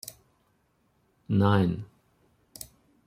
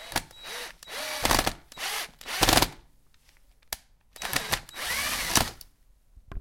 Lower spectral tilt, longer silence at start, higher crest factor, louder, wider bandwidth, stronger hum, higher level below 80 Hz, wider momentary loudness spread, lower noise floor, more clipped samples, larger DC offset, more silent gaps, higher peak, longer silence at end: first, -7 dB/octave vs -2 dB/octave; about the same, 0.05 s vs 0 s; about the same, 22 dB vs 24 dB; about the same, -26 LUFS vs -28 LUFS; about the same, 16 kHz vs 17 kHz; neither; second, -62 dBFS vs -42 dBFS; first, 22 LU vs 16 LU; first, -70 dBFS vs -59 dBFS; neither; neither; neither; about the same, -8 dBFS vs -6 dBFS; first, 0.4 s vs 0 s